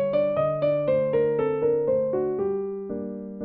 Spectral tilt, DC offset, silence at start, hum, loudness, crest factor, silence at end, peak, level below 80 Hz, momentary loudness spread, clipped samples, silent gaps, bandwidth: -11.5 dB/octave; under 0.1%; 0 s; none; -25 LUFS; 12 dB; 0 s; -12 dBFS; -60 dBFS; 9 LU; under 0.1%; none; 4.5 kHz